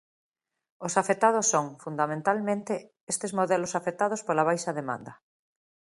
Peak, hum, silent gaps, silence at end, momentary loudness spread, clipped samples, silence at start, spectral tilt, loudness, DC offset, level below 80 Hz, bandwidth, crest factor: -8 dBFS; none; 3.01-3.07 s; 0.85 s; 12 LU; under 0.1%; 0.8 s; -4 dB/octave; -28 LUFS; under 0.1%; -76 dBFS; 11.5 kHz; 22 dB